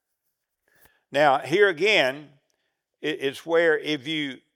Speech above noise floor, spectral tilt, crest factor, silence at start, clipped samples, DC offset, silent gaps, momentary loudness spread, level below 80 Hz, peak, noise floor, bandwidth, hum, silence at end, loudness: 56 dB; -4 dB/octave; 20 dB; 1.1 s; under 0.1%; under 0.1%; none; 10 LU; -86 dBFS; -4 dBFS; -79 dBFS; 15 kHz; none; 0.2 s; -23 LUFS